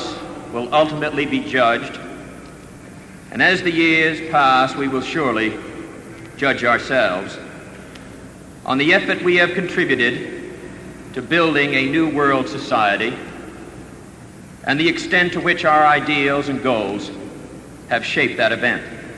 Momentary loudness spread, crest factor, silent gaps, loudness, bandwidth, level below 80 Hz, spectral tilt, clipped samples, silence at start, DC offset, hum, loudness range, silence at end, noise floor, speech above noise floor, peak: 22 LU; 18 dB; none; -17 LUFS; 11 kHz; -50 dBFS; -5 dB/octave; under 0.1%; 0 s; under 0.1%; none; 3 LU; 0 s; -39 dBFS; 21 dB; -2 dBFS